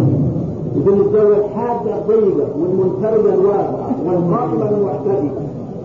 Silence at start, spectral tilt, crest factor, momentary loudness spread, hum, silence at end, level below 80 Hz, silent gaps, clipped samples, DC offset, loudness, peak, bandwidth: 0 s; -11 dB/octave; 10 dB; 7 LU; none; 0 s; -46 dBFS; none; under 0.1%; 0.2%; -16 LUFS; -4 dBFS; 3.5 kHz